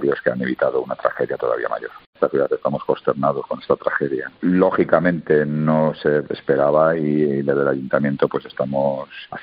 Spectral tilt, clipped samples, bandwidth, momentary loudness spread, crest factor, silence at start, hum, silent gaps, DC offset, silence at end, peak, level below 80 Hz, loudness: -11.5 dB/octave; under 0.1%; 5.2 kHz; 7 LU; 18 dB; 0 s; none; 2.06-2.13 s; under 0.1%; 0 s; -2 dBFS; -58 dBFS; -20 LUFS